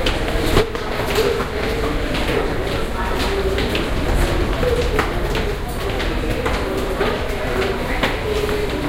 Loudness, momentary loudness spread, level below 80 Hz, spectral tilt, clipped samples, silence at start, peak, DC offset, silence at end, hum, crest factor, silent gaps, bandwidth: -21 LUFS; 4 LU; -24 dBFS; -5 dB/octave; under 0.1%; 0 s; 0 dBFS; under 0.1%; 0 s; none; 18 dB; none; 16.5 kHz